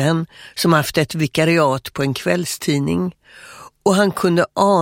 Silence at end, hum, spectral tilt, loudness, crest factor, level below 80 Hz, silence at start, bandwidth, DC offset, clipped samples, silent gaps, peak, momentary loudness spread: 0 s; none; -5.5 dB/octave; -18 LUFS; 18 dB; -52 dBFS; 0 s; 16.5 kHz; under 0.1%; under 0.1%; none; 0 dBFS; 7 LU